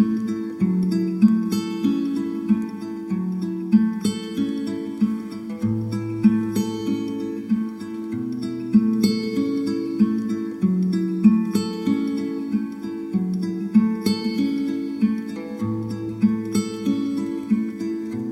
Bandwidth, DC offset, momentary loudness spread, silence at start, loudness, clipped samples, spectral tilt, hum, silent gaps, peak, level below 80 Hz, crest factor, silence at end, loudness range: 13.5 kHz; under 0.1%; 9 LU; 0 s; -23 LUFS; under 0.1%; -7 dB/octave; none; none; -4 dBFS; -60 dBFS; 18 dB; 0 s; 3 LU